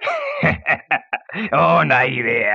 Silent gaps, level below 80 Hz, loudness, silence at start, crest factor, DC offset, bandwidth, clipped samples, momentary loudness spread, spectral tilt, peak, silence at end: none; -52 dBFS; -17 LUFS; 0 s; 16 dB; under 0.1%; 7.4 kHz; under 0.1%; 8 LU; -7 dB/octave; -2 dBFS; 0 s